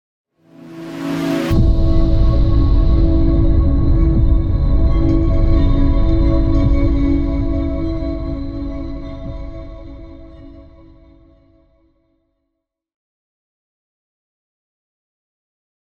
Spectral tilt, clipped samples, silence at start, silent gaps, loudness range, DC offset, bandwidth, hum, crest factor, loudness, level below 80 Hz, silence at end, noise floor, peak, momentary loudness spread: -9 dB/octave; under 0.1%; 0.65 s; none; 16 LU; under 0.1%; 6.8 kHz; none; 12 dB; -17 LUFS; -18 dBFS; 5.4 s; -76 dBFS; -4 dBFS; 17 LU